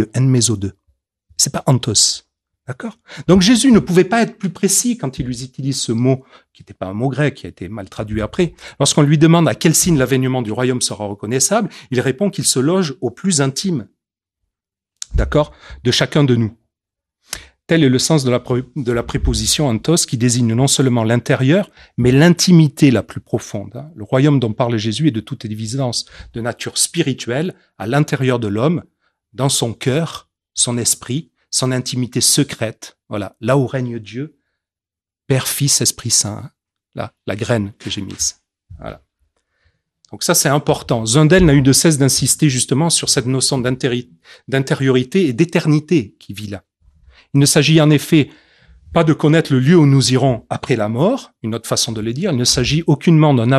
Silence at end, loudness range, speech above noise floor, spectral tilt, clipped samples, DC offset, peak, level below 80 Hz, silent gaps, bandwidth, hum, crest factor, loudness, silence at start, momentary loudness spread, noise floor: 0 s; 6 LU; 74 dB; -4.5 dB/octave; under 0.1%; under 0.1%; 0 dBFS; -38 dBFS; none; 13.5 kHz; none; 16 dB; -15 LUFS; 0 s; 16 LU; -89 dBFS